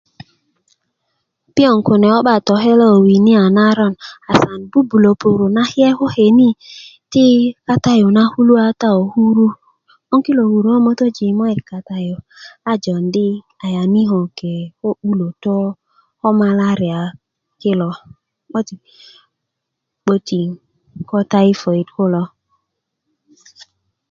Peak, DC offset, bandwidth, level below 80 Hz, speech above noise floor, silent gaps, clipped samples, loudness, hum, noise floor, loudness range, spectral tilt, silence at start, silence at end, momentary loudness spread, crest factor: 0 dBFS; under 0.1%; 7.2 kHz; -54 dBFS; 64 dB; none; under 0.1%; -14 LUFS; none; -77 dBFS; 8 LU; -7.5 dB/octave; 1.55 s; 1.85 s; 14 LU; 14 dB